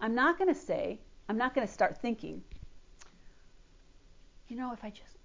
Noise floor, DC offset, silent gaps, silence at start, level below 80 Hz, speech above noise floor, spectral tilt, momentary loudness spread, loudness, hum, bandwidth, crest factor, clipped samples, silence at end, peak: -58 dBFS; under 0.1%; none; 0 s; -58 dBFS; 25 dB; -5.5 dB/octave; 19 LU; -33 LUFS; none; 7.6 kHz; 18 dB; under 0.1%; 0.1 s; -16 dBFS